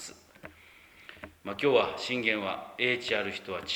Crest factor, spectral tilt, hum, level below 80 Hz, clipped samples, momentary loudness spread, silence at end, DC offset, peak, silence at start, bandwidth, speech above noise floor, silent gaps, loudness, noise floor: 22 dB; -3.5 dB/octave; none; -66 dBFS; under 0.1%; 24 LU; 0 s; under 0.1%; -10 dBFS; 0 s; over 20 kHz; 26 dB; none; -29 LUFS; -56 dBFS